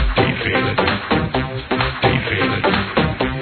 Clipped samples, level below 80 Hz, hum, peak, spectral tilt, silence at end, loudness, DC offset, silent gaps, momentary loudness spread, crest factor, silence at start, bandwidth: under 0.1%; -30 dBFS; none; -2 dBFS; -9 dB/octave; 0 s; -18 LUFS; under 0.1%; none; 3 LU; 16 dB; 0 s; 4.6 kHz